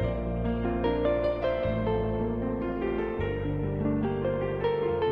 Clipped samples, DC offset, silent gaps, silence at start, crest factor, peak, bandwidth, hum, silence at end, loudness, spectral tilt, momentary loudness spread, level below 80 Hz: under 0.1%; under 0.1%; none; 0 s; 12 dB; -16 dBFS; 5.4 kHz; none; 0 s; -29 LUFS; -10 dB/octave; 4 LU; -38 dBFS